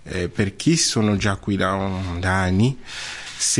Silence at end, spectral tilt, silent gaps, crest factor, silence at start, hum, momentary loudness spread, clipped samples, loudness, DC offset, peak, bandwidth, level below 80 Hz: 0 s; -4 dB/octave; none; 14 dB; 0.05 s; none; 12 LU; under 0.1%; -21 LUFS; 0.3%; -6 dBFS; 11.5 kHz; -46 dBFS